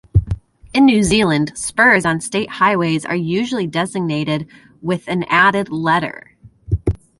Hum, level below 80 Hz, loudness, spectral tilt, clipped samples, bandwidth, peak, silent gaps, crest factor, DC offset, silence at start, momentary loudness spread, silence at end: none; -34 dBFS; -16 LUFS; -5 dB/octave; under 0.1%; 11.5 kHz; 0 dBFS; none; 16 dB; under 0.1%; 0.15 s; 12 LU; 0.25 s